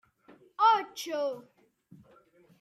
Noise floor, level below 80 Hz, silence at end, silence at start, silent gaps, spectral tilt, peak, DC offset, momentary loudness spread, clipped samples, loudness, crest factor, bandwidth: -61 dBFS; -84 dBFS; 1.2 s; 0.6 s; none; -2.5 dB/octave; -12 dBFS; under 0.1%; 20 LU; under 0.1%; -28 LUFS; 20 dB; 15.5 kHz